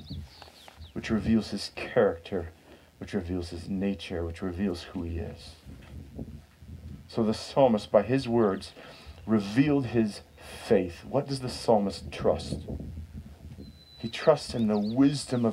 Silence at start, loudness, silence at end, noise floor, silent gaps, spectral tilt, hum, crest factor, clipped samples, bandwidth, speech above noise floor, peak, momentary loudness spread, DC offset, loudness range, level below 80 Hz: 0 s; -28 LUFS; 0 s; -50 dBFS; none; -6.5 dB/octave; none; 22 dB; under 0.1%; 13.5 kHz; 23 dB; -8 dBFS; 22 LU; under 0.1%; 8 LU; -50 dBFS